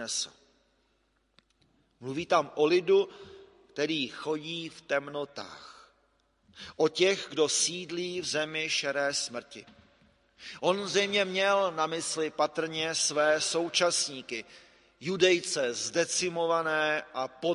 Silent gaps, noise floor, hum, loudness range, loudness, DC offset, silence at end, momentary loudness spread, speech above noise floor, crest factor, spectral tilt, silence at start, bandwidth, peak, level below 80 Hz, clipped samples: none; -72 dBFS; none; 5 LU; -29 LUFS; under 0.1%; 0 s; 14 LU; 43 dB; 22 dB; -2.5 dB/octave; 0 s; 11.5 kHz; -8 dBFS; -72 dBFS; under 0.1%